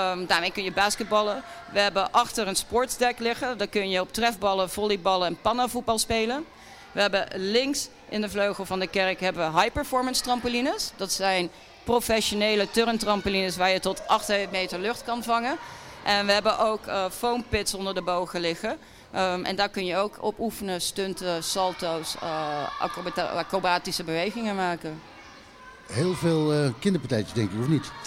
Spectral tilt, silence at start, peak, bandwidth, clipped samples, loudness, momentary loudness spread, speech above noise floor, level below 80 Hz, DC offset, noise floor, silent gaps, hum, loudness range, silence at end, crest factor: -3.5 dB/octave; 0 s; -8 dBFS; 16 kHz; under 0.1%; -26 LUFS; 7 LU; 21 dB; -52 dBFS; under 0.1%; -48 dBFS; none; none; 4 LU; 0 s; 18 dB